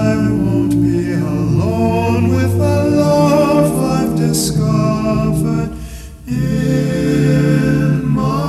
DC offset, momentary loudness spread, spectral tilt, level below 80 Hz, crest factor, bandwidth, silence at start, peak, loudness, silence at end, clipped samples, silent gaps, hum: under 0.1%; 6 LU; -7 dB/octave; -32 dBFS; 12 dB; 14 kHz; 0 s; -2 dBFS; -14 LUFS; 0 s; under 0.1%; none; none